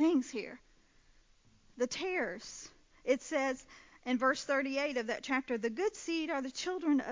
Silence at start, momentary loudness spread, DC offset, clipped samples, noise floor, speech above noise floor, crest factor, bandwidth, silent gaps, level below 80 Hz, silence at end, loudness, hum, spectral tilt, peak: 0 s; 14 LU; under 0.1%; under 0.1%; -66 dBFS; 31 dB; 18 dB; 7.6 kHz; none; -70 dBFS; 0 s; -35 LUFS; none; -3 dB/octave; -16 dBFS